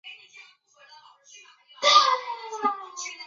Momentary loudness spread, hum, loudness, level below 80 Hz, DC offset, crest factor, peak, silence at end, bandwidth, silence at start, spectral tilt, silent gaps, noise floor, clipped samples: 22 LU; none; -22 LUFS; -90 dBFS; under 0.1%; 22 dB; -6 dBFS; 0 s; 7.6 kHz; 0.05 s; 1 dB/octave; none; -55 dBFS; under 0.1%